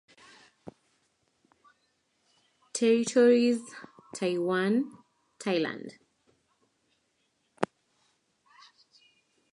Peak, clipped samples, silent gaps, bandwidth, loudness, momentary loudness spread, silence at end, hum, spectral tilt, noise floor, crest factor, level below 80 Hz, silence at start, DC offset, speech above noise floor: -6 dBFS; under 0.1%; none; 11.5 kHz; -28 LUFS; 23 LU; 1.85 s; none; -4.5 dB/octave; -75 dBFS; 24 dB; -80 dBFS; 2.75 s; under 0.1%; 49 dB